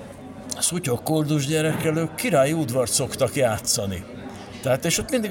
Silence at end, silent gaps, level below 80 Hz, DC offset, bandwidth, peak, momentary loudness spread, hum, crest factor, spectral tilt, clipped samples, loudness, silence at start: 0 s; none; -50 dBFS; under 0.1%; 17 kHz; -8 dBFS; 14 LU; none; 16 dB; -4 dB/octave; under 0.1%; -22 LUFS; 0 s